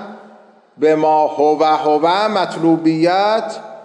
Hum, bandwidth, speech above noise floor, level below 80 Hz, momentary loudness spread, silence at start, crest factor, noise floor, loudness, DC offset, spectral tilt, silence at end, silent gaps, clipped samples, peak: none; 10.5 kHz; 31 dB; -76 dBFS; 5 LU; 0 s; 12 dB; -45 dBFS; -15 LUFS; under 0.1%; -6 dB/octave; 0 s; none; under 0.1%; -4 dBFS